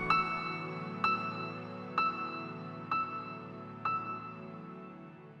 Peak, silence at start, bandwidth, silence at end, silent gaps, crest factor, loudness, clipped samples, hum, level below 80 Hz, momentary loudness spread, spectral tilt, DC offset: -16 dBFS; 0 s; 9 kHz; 0 s; none; 22 dB; -36 LUFS; under 0.1%; none; -66 dBFS; 15 LU; -6.5 dB/octave; under 0.1%